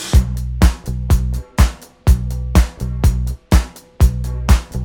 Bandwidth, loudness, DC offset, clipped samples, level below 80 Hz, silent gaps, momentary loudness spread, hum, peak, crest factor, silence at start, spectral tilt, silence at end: 17.5 kHz; -18 LUFS; under 0.1%; under 0.1%; -16 dBFS; none; 6 LU; none; 0 dBFS; 14 dB; 0 s; -6 dB/octave; 0 s